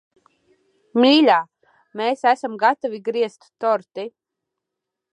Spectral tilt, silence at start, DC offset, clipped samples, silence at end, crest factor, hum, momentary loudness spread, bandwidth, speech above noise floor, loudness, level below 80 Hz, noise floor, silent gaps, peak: -4.5 dB/octave; 0.95 s; under 0.1%; under 0.1%; 1.05 s; 18 dB; none; 19 LU; 10.5 kHz; 64 dB; -19 LUFS; -80 dBFS; -83 dBFS; none; -2 dBFS